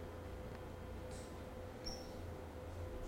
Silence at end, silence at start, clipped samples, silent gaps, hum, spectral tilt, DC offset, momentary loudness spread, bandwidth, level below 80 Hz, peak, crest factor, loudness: 0 s; 0 s; under 0.1%; none; none; -5.5 dB/octave; under 0.1%; 3 LU; 16.5 kHz; -56 dBFS; -32 dBFS; 16 dB; -50 LUFS